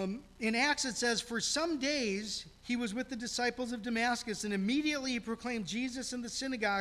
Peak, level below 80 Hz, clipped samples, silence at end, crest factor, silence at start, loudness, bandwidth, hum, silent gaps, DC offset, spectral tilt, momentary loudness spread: -18 dBFS; -62 dBFS; under 0.1%; 0 s; 18 dB; 0 s; -34 LUFS; 14.5 kHz; none; none; under 0.1%; -3 dB/octave; 7 LU